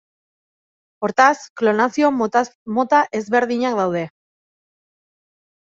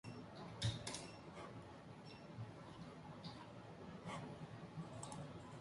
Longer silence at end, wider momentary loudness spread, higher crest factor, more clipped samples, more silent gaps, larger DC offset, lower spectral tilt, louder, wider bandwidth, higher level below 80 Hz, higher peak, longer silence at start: first, 1.7 s vs 0 s; second, 8 LU vs 11 LU; about the same, 20 dB vs 22 dB; neither; first, 1.50-1.56 s, 2.55-2.66 s vs none; neither; about the same, -5 dB/octave vs -4.5 dB/octave; first, -18 LUFS vs -52 LUFS; second, 7.8 kHz vs 11.5 kHz; about the same, -68 dBFS vs -68 dBFS; first, 0 dBFS vs -30 dBFS; first, 1 s vs 0.05 s